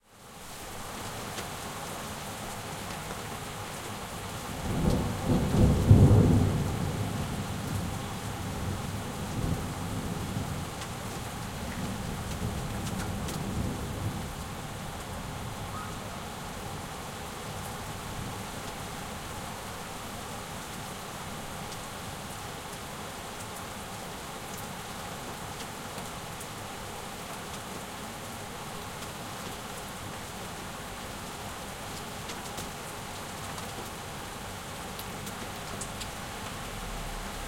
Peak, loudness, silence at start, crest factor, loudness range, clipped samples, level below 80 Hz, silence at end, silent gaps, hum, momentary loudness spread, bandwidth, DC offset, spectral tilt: -6 dBFS; -34 LUFS; 0.1 s; 28 dB; 13 LU; under 0.1%; -44 dBFS; 0 s; none; none; 8 LU; 16.5 kHz; under 0.1%; -5 dB/octave